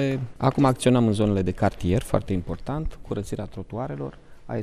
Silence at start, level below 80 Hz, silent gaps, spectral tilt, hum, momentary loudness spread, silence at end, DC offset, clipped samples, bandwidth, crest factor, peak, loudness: 0 s; -40 dBFS; none; -7 dB/octave; none; 13 LU; 0 s; under 0.1%; under 0.1%; 13.5 kHz; 20 dB; -6 dBFS; -25 LUFS